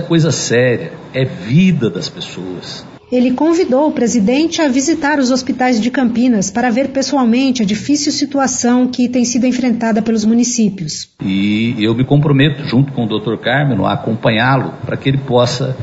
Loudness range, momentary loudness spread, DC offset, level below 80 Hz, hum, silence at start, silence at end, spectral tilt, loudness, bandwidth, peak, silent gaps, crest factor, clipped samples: 2 LU; 7 LU; under 0.1%; -46 dBFS; none; 0 s; 0 s; -5 dB/octave; -14 LUFS; 8 kHz; 0 dBFS; none; 12 dB; under 0.1%